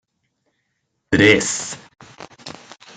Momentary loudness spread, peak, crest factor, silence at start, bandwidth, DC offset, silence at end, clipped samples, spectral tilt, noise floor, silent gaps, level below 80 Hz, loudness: 24 LU; 0 dBFS; 22 dB; 1.1 s; 9.4 kHz; under 0.1%; 0.45 s; under 0.1%; -3.5 dB/octave; -73 dBFS; none; -56 dBFS; -16 LUFS